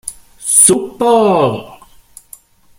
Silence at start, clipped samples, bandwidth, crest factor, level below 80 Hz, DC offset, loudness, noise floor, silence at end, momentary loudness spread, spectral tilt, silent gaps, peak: 0.05 s; 0.2%; 17 kHz; 14 dB; -50 dBFS; under 0.1%; -10 LUFS; -42 dBFS; 1.05 s; 18 LU; -3.5 dB/octave; none; 0 dBFS